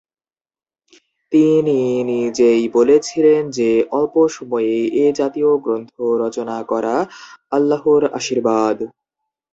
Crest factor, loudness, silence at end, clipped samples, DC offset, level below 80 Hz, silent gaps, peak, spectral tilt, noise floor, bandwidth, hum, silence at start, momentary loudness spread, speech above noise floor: 14 dB; -17 LUFS; 0.65 s; under 0.1%; under 0.1%; -60 dBFS; none; -2 dBFS; -5.5 dB/octave; under -90 dBFS; 8 kHz; none; 1.3 s; 8 LU; over 74 dB